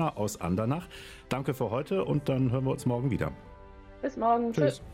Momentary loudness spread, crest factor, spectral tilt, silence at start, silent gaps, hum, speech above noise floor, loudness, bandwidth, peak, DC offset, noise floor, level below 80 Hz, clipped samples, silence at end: 10 LU; 16 dB; -7 dB/octave; 0 s; none; none; 20 dB; -30 LUFS; 16 kHz; -12 dBFS; under 0.1%; -49 dBFS; -52 dBFS; under 0.1%; 0 s